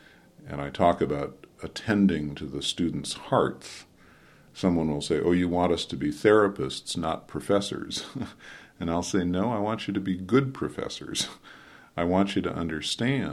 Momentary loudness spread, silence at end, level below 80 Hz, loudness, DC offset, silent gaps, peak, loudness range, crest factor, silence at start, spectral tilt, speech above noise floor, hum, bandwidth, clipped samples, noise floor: 14 LU; 0 s; -52 dBFS; -27 LUFS; under 0.1%; none; -6 dBFS; 4 LU; 20 dB; 0.4 s; -5.5 dB/octave; 28 dB; none; 13 kHz; under 0.1%; -55 dBFS